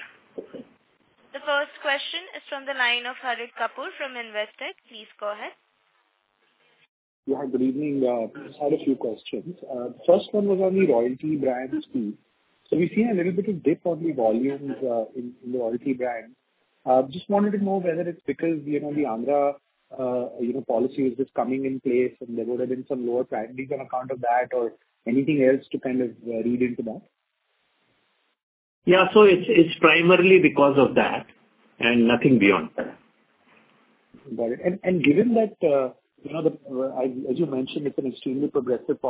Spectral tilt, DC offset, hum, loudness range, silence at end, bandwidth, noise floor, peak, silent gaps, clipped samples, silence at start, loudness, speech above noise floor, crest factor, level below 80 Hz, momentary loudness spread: -10 dB/octave; under 0.1%; none; 10 LU; 0 s; 4 kHz; -73 dBFS; -2 dBFS; 6.89-7.23 s, 28.43-28.82 s; under 0.1%; 0 s; -23 LUFS; 50 dB; 22 dB; -64 dBFS; 16 LU